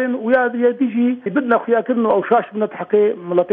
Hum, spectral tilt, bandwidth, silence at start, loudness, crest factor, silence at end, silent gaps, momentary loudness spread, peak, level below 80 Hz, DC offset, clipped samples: none; -10 dB/octave; 3.9 kHz; 0 s; -17 LUFS; 14 dB; 0 s; none; 4 LU; -2 dBFS; -66 dBFS; under 0.1%; under 0.1%